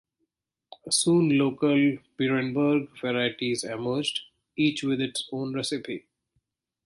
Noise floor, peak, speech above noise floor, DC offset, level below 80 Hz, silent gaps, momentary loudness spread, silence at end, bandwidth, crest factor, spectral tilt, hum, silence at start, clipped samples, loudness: -80 dBFS; -12 dBFS; 55 dB; under 0.1%; -68 dBFS; none; 11 LU; 0.85 s; 11.5 kHz; 16 dB; -4.5 dB/octave; none; 0.85 s; under 0.1%; -26 LUFS